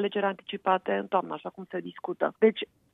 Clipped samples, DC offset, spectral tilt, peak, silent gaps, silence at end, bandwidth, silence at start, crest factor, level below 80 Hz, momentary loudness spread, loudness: under 0.1%; under 0.1%; -8 dB/octave; -10 dBFS; none; 0.3 s; 4 kHz; 0 s; 18 dB; -78 dBFS; 13 LU; -29 LUFS